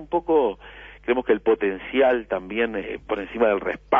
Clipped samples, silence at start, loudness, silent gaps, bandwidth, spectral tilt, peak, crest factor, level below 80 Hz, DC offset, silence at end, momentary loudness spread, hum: under 0.1%; 0 s; -23 LUFS; none; 3.7 kHz; -7.5 dB/octave; -6 dBFS; 16 dB; -50 dBFS; under 0.1%; 0 s; 10 LU; none